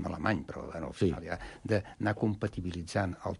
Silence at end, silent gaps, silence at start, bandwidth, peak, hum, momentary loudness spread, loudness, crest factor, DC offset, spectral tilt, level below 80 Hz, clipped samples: 0 s; none; 0 s; 11.5 kHz; -14 dBFS; none; 9 LU; -34 LUFS; 20 dB; under 0.1%; -7 dB/octave; -48 dBFS; under 0.1%